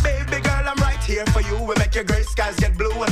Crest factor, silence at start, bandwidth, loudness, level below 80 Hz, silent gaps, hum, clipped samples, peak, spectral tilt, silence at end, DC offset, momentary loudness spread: 12 dB; 0 s; 14 kHz; -21 LUFS; -22 dBFS; none; none; under 0.1%; -8 dBFS; -5 dB/octave; 0 s; under 0.1%; 2 LU